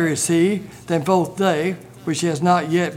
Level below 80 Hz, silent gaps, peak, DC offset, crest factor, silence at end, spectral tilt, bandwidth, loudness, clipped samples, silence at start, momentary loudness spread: -58 dBFS; none; -4 dBFS; under 0.1%; 16 dB; 0 s; -5 dB/octave; 16.5 kHz; -20 LUFS; under 0.1%; 0 s; 8 LU